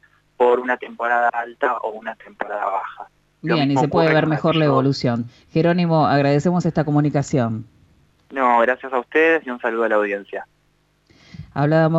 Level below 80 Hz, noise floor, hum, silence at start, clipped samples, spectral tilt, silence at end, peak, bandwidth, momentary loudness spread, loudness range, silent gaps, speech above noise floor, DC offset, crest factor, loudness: -56 dBFS; -62 dBFS; 50 Hz at -45 dBFS; 0.4 s; under 0.1%; -7 dB/octave; 0 s; -4 dBFS; 8 kHz; 14 LU; 4 LU; none; 43 dB; under 0.1%; 14 dB; -19 LUFS